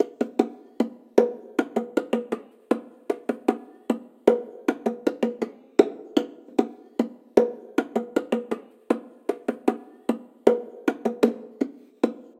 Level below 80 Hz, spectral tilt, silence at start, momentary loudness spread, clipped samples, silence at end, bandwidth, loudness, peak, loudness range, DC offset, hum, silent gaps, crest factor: -70 dBFS; -6 dB/octave; 0 s; 9 LU; under 0.1%; 0.15 s; 15.5 kHz; -27 LUFS; 0 dBFS; 2 LU; under 0.1%; none; none; 26 dB